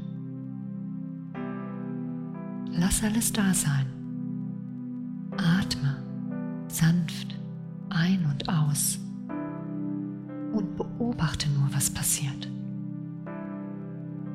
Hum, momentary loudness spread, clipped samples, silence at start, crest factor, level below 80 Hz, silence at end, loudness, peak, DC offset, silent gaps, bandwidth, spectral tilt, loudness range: none; 13 LU; under 0.1%; 0 s; 16 dB; -50 dBFS; 0 s; -30 LUFS; -12 dBFS; under 0.1%; none; 16 kHz; -4.5 dB/octave; 2 LU